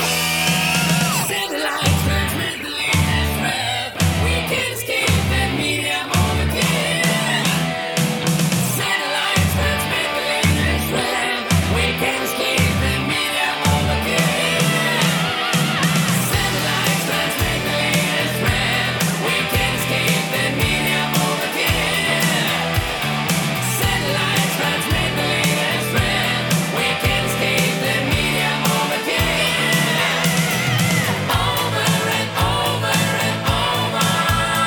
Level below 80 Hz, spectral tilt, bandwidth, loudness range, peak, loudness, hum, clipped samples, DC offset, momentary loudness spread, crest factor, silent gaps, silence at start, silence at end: -34 dBFS; -3.5 dB/octave; over 20 kHz; 1 LU; -2 dBFS; -18 LUFS; none; under 0.1%; under 0.1%; 3 LU; 16 dB; none; 0 s; 0 s